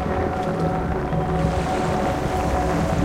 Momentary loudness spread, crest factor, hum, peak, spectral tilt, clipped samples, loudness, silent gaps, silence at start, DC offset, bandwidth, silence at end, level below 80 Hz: 2 LU; 14 dB; none; -8 dBFS; -7 dB/octave; under 0.1%; -23 LUFS; none; 0 s; under 0.1%; 15.5 kHz; 0 s; -32 dBFS